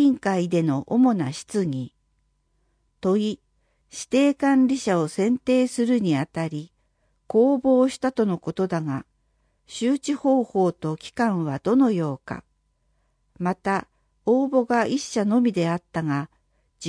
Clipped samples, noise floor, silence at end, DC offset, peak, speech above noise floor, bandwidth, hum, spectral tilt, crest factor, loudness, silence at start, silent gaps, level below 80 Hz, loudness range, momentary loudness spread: under 0.1%; -69 dBFS; 0 s; under 0.1%; -8 dBFS; 47 dB; 10.5 kHz; none; -6.5 dB/octave; 14 dB; -23 LUFS; 0 s; none; -62 dBFS; 3 LU; 11 LU